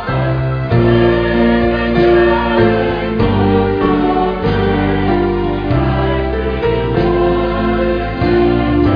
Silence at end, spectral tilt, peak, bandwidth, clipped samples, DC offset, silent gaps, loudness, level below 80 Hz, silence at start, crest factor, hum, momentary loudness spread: 0 s; -9.5 dB/octave; 0 dBFS; 5.2 kHz; under 0.1%; under 0.1%; none; -14 LUFS; -24 dBFS; 0 s; 12 dB; none; 5 LU